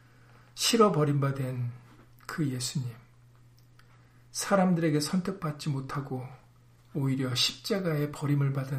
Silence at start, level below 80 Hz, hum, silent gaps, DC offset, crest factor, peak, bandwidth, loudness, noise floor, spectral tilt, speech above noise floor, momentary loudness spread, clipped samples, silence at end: 0.55 s; -62 dBFS; none; none; under 0.1%; 20 dB; -10 dBFS; 15.5 kHz; -29 LUFS; -58 dBFS; -5 dB/octave; 30 dB; 15 LU; under 0.1%; 0 s